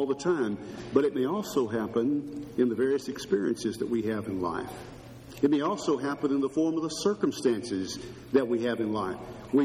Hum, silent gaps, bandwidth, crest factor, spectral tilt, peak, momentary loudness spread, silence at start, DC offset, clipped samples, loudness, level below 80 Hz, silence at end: none; none; 14 kHz; 20 dB; -5.5 dB/octave; -10 dBFS; 10 LU; 0 s; under 0.1%; under 0.1%; -29 LUFS; -60 dBFS; 0 s